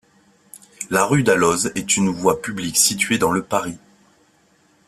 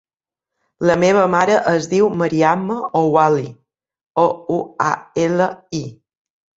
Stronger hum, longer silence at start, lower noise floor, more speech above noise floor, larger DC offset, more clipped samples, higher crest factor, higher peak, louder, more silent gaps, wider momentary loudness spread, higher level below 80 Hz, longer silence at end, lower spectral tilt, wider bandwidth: neither; second, 0.55 s vs 0.8 s; second, -58 dBFS vs -88 dBFS; second, 39 dB vs 71 dB; neither; neither; about the same, 20 dB vs 16 dB; about the same, -2 dBFS vs -2 dBFS; about the same, -18 LUFS vs -17 LUFS; second, none vs 4.06-4.14 s; second, 8 LU vs 11 LU; about the same, -54 dBFS vs -58 dBFS; first, 1.1 s vs 0.65 s; second, -3.5 dB/octave vs -6 dB/octave; first, 15.5 kHz vs 8 kHz